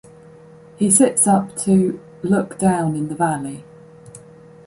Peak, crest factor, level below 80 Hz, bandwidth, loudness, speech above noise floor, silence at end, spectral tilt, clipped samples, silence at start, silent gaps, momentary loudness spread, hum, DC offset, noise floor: 0 dBFS; 18 dB; -56 dBFS; 11.5 kHz; -18 LUFS; 26 dB; 0.5 s; -5.5 dB/octave; under 0.1%; 0.8 s; none; 13 LU; none; under 0.1%; -44 dBFS